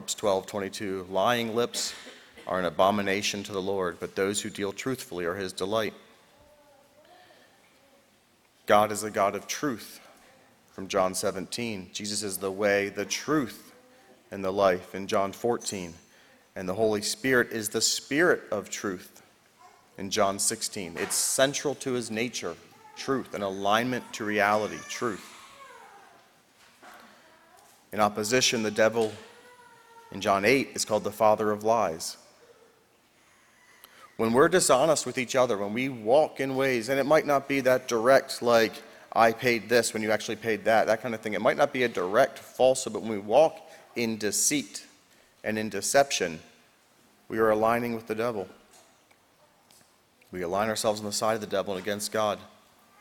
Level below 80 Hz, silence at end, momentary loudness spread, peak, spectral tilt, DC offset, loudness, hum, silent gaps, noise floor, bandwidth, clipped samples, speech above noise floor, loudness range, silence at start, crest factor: -66 dBFS; 0.55 s; 13 LU; -6 dBFS; -3 dB/octave; under 0.1%; -27 LUFS; none; none; -63 dBFS; 19 kHz; under 0.1%; 37 dB; 7 LU; 0 s; 22 dB